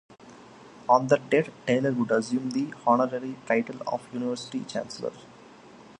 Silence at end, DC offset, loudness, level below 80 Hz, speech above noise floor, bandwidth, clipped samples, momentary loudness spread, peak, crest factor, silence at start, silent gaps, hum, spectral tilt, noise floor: 0.05 s; under 0.1%; -27 LUFS; -72 dBFS; 24 dB; 10.5 kHz; under 0.1%; 11 LU; -6 dBFS; 20 dB; 0.1 s; none; none; -6 dB/octave; -50 dBFS